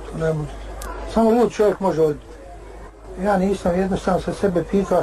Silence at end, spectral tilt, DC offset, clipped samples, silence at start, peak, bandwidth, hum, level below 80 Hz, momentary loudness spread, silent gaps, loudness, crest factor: 0 s; -7 dB/octave; under 0.1%; under 0.1%; 0 s; -8 dBFS; 13 kHz; none; -38 dBFS; 22 LU; none; -20 LUFS; 14 dB